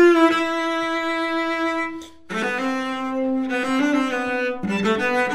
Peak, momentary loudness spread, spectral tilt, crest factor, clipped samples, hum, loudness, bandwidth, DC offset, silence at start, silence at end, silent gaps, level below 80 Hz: -4 dBFS; 7 LU; -5 dB/octave; 16 dB; under 0.1%; none; -22 LUFS; 12.5 kHz; 0.5%; 0 s; 0 s; none; -58 dBFS